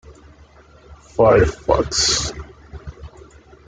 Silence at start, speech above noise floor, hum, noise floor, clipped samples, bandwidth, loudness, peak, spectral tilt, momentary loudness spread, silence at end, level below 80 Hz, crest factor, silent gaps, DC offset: 0.1 s; 31 dB; none; -47 dBFS; under 0.1%; 9.6 kHz; -16 LUFS; -2 dBFS; -3.5 dB/octave; 24 LU; 0.6 s; -36 dBFS; 18 dB; none; under 0.1%